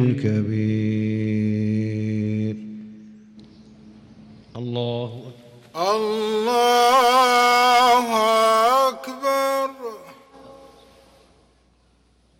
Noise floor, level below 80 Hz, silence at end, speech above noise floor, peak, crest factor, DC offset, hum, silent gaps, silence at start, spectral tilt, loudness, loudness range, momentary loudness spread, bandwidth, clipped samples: -60 dBFS; -62 dBFS; 1.85 s; 39 dB; -8 dBFS; 12 dB; under 0.1%; none; none; 0 s; -5 dB/octave; -19 LUFS; 13 LU; 19 LU; 17 kHz; under 0.1%